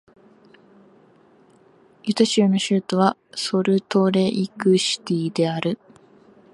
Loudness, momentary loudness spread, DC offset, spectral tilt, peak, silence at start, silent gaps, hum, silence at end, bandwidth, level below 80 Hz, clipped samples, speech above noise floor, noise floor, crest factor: -21 LUFS; 9 LU; under 0.1%; -5.5 dB/octave; -2 dBFS; 2.05 s; none; none; 0.8 s; 11.5 kHz; -68 dBFS; under 0.1%; 34 dB; -54 dBFS; 20 dB